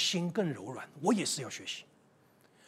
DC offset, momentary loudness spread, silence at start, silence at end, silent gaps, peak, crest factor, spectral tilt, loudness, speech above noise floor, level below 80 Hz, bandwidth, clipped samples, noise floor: under 0.1%; 12 LU; 0 s; 0.85 s; none; -16 dBFS; 18 dB; -3.5 dB/octave; -34 LUFS; 31 dB; -84 dBFS; 16 kHz; under 0.1%; -65 dBFS